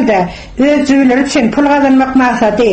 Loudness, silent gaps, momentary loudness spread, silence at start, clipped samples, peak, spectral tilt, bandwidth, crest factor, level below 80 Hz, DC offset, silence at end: -10 LUFS; none; 4 LU; 0 s; under 0.1%; 0 dBFS; -5.5 dB/octave; 8.6 kHz; 10 dB; -36 dBFS; under 0.1%; 0 s